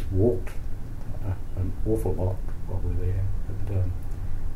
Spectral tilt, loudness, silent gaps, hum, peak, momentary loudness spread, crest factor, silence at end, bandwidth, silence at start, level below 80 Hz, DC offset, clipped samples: -9 dB/octave; -30 LUFS; none; none; -10 dBFS; 12 LU; 14 dB; 0 s; 12.5 kHz; 0 s; -30 dBFS; under 0.1%; under 0.1%